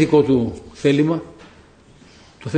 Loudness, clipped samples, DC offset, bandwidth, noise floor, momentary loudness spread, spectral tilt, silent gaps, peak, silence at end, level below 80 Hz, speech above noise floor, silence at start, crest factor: -19 LUFS; under 0.1%; under 0.1%; 9.4 kHz; -48 dBFS; 18 LU; -7.5 dB/octave; none; -2 dBFS; 0 s; -48 dBFS; 32 dB; 0 s; 18 dB